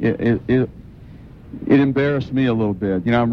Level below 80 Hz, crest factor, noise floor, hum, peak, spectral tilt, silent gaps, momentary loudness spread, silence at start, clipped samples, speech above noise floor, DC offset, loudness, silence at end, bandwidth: -44 dBFS; 16 dB; -40 dBFS; none; -2 dBFS; -9.5 dB/octave; none; 9 LU; 0 s; under 0.1%; 22 dB; under 0.1%; -19 LUFS; 0 s; 6 kHz